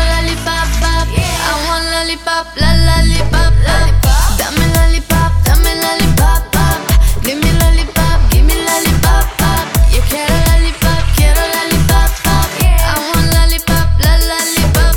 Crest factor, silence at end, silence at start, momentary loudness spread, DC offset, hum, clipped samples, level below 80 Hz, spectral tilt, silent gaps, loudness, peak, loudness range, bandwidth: 10 dB; 0 s; 0 s; 3 LU; under 0.1%; none; under 0.1%; -12 dBFS; -4 dB/octave; none; -12 LUFS; 0 dBFS; 1 LU; 19 kHz